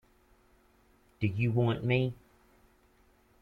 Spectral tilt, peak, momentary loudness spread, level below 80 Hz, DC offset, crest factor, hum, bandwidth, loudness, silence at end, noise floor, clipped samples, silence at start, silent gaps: -9 dB/octave; -14 dBFS; 7 LU; -62 dBFS; under 0.1%; 20 dB; none; 4.9 kHz; -31 LUFS; 1.25 s; -65 dBFS; under 0.1%; 1.2 s; none